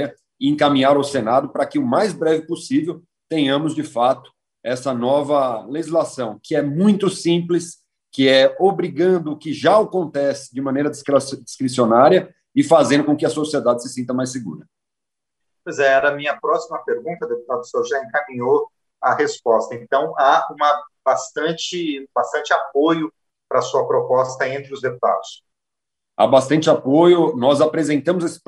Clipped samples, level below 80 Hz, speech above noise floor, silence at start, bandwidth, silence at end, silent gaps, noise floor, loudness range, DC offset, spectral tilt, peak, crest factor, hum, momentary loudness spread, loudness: under 0.1%; -68 dBFS; 67 dB; 0 s; 12 kHz; 0.1 s; none; -85 dBFS; 4 LU; under 0.1%; -5 dB/octave; 0 dBFS; 18 dB; none; 11 LU; -18 LUFS